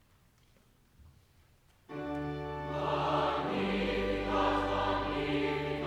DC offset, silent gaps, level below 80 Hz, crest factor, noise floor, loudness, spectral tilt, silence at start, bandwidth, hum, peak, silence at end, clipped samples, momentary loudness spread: under 0.1%; none; -50 dBFS; 16 dB; -65 dBFS; -33 LUFS; -6.5 dB/octave; 1 s; 13 kHz; none; -18 dBFS; 0 s; under 0.1%; 8 LU